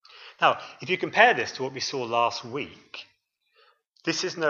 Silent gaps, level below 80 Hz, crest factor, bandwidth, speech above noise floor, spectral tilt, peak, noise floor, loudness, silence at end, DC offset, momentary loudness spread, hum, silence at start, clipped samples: none; -74 dBFS; 24 dB; 7.4 kHz; 44 dB; -3 dB/octave; -2 dBFS; -69 dBFS; -25 LUFS; 0 s; under 0.1%; 18 LU; none; 0.15 s; under 0.1%